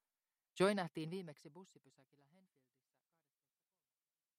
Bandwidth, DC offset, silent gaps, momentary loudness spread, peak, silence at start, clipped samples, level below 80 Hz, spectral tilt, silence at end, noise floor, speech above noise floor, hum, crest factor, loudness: 14 kHz; under 0.1%; none; 23 LU; -22 dBFS; 0.55 s; under 0.1%; -90 dBFS; -5.5 dB/octave; 2.75 s; under -90 dBFS; over 47 dB; none; 24 dB; -40 LUFS